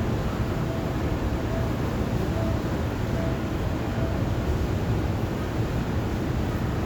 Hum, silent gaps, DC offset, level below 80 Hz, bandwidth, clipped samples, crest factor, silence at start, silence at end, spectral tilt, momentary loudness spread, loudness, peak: none; none; under 0.1%; -34 dBFS; over 20 kHz; under 0.1%; 12 dB; 0 s; 0 s; -7 dB/octave; 2 LU; -27 LUFS; -14 dBFS